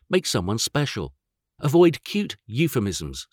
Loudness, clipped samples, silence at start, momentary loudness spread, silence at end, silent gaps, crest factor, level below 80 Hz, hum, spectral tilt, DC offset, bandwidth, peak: -23 LUFS; under 0.1%; 0.1 s; 12 LU; 0.1 s; none; 16 dB; -50 dBFS; none; -5 dB/octave; under 0.1%; 19 kHz; -6 dBFS